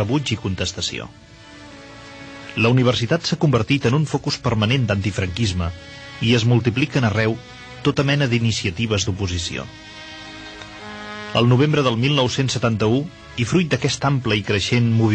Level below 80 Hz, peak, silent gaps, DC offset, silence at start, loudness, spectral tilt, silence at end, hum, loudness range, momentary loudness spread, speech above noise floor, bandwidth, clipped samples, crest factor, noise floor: -44 dBFS; -4 dBFS; none; under 0.1%; 0 s; -20 LUFS; -5.5 dB/octave; 0 s; none; 3 LU; 18 LU; 22 dB; 9 kHz; under 0.1%; 16 dB; -41 dBFS